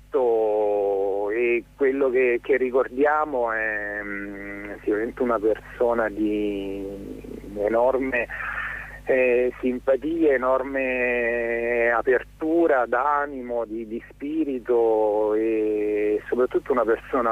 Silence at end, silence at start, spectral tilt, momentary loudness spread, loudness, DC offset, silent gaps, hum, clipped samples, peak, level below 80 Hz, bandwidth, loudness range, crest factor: 0 s; 0.15 s; -7 dB/octave; 10 LU; -23 LUFS; under 0.1%; none; 50 Hz at -50 dBFS; under 0.1%; -10 dBFS; -50 dBFS; 12 kHz; 4 LU; 12 dB